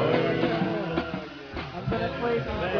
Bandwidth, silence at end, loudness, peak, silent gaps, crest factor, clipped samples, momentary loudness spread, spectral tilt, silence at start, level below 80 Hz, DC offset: 5.4 kHz; 0 s; -28 LUFS; -10 dBFS; none; 18 dB; under 0.1%; 12 LU; -7.5 dB/octave; 0 s; -46 dBFS; under 0.1%